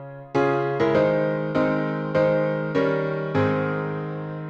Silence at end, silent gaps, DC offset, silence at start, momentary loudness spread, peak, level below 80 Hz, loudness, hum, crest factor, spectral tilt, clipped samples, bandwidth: 0 s; none; under 0.1%; 0 s; 7 LU; -8 dBFS; -58 dBFS; -23 LUFS; none; 14 dB; -8.5 dB/octave; under 0.1%; 7.2 kHz